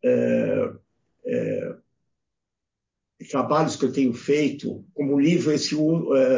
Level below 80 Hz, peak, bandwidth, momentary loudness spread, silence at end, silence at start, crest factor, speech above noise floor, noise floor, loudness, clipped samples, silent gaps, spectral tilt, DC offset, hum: -66 dBFS; -8 dBFS; 7.6 kHz; 11 LU; 0 s; 0.05 s; 14 dB; 64 dB; -85 dBFS; -23 LUFS; under 0.1%; none; -6 dB/octave; under 0.1%; none